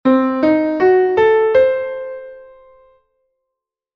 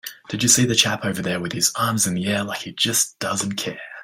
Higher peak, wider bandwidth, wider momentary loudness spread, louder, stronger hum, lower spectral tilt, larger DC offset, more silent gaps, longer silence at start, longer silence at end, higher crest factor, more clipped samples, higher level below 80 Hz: about the same, -2 dBFS vs -2 dBFS; second, 6.2 kHz vs 16.5 kHz; first, 15 LU vs 11 LU; first, -14 LUFS vs -20 LUFS; neither; first, -7.5 dB/octave vs -2.5 dB/octave; neither; neither; about the same, 0.05 s vs 0.05 s; first, 1.55 s vs 0 s; second, 14 dB vs 20 dB; neither; about the same, -54 dBFS vs -58 dBFS